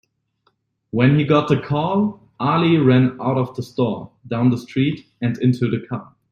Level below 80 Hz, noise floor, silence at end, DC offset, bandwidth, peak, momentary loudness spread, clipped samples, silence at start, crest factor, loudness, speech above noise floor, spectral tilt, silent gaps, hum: -54 dBFS; -66 dBFS; 0.3 s; under 0.1%; 7.2 kHz; -2 dBFS; 11 LU; under 0.1%; 0.95 s; 16 dB; -19 LUFS; 48 dB; -8.5 dB/octave; none; none